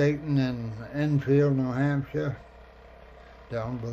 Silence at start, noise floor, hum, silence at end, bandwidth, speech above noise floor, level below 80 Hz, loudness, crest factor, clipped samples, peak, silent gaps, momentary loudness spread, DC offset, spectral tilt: 0 s; -49 dBFS; none; 0 s; 7 kHz; 23 dB; -52 dBFS; -27 LUFS; 16 dB; under 0.1%; -12 dBFS; none; 12 LU; under 0.1%; -8.5 dB/octave